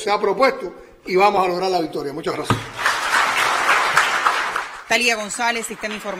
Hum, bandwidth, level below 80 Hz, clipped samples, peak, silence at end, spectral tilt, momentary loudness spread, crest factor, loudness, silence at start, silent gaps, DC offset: none; 16 kHz; -54 dBFS; under 0.1%; -2 dBFS; 0 s; -3 dB/octave; 10 LU; 18 dB; -19 LUFS; 0 s; none; under 0.1%